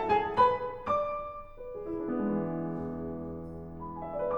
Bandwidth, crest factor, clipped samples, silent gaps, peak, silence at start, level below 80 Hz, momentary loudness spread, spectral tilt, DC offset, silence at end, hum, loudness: 19 kHz; 20 dB; under 0.1%; none; -12 dBFS; 0 s; -52 dBFS; 16 LU; -8 dB/octave; under 0.1%; 0 s; none; -32 LUFS